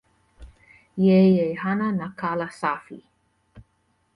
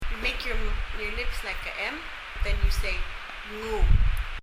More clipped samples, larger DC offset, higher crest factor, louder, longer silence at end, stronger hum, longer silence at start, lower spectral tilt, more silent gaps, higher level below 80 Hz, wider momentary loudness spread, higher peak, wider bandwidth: neither; neither; about the same, 16 dB vs 18 dB; first, -22 LUFS vs -30 LUFS; first, 0.55 s vs 0 s; neither; first, 0.4 s vs 0 s; first, -8.5 dB/octave vs -4.5 dB/octave; neither; second, -56 dBFS vs -28 dBFS; about the same, 11 LU vs 10 LU; about the same, -8 dBFS vs -8 dBFS; second, 10.5 kHz vs 15 kHz